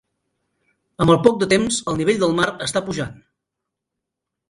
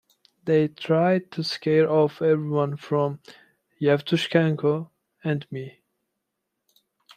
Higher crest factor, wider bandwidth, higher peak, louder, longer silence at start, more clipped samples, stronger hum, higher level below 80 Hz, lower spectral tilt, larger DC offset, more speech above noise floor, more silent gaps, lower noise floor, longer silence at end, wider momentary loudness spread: about the same, 20 dB vs 20 dB; first, 11.5 kHz vs 10 kHz; first, 0 dBFS vs -4 dBFS; first, -19 LUFS vs -23 LUFS; first, 1 s vs 0.45 s; neither; neither; first, -50 dBFS vs -70 dBFS; second, -4.5 dB/octave vs -7 dB/octave; neither; first, 64 dB vs 58 dB; neither; about the same, -82 dBFS vs -81 dBFS; about the same, 1.35 s vs 1.45 s; second, 11 LU vs 14 LU